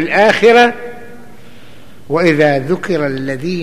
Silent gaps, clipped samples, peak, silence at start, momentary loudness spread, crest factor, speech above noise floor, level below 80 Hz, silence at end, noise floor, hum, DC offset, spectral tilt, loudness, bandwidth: none; under 0.1%; 0 dBFS; 0 s; 12 LU; 14 dB; 29 dB; -52 dBFS; 0 s; -40 dBFS; none; 3%; -5.5 dB/octave; -12 LUFS; 14 kHz